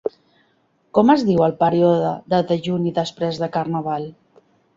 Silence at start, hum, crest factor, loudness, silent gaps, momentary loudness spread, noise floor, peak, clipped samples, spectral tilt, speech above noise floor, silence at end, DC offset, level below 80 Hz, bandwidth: 0.05 s; none; 18 dB; -19 LUFS; none; 10 LU; -62 dBFS; -2 dBFS; under 0.1%; -7.5 dB/octave; 44 dB; 0.65 s; under 0.1%; -58 dBFS; 7.8 kHz